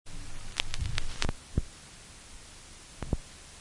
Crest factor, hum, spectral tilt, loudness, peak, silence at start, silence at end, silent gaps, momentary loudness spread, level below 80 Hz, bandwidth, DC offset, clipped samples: 28 dB; none; -3.5 dB/octave; -37 LUFS; -6 dBFS; 0.05 s; 0 s; none; 15 LU; -40 dBFS; 11.5 kHz; under 0.1%; under 0.1%